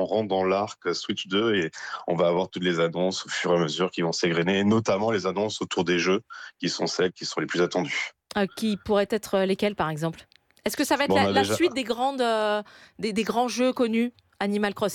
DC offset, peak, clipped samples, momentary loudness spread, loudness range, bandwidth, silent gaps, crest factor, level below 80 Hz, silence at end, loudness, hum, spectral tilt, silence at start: under 0.1%; -10 dBFS; under 0.1%; 8 LU; 2 LU; 17 kHz; none; 16 dB; -62 dBFS; 0 s; -25 LUFS; none; -4.5 dB/octave; 0 s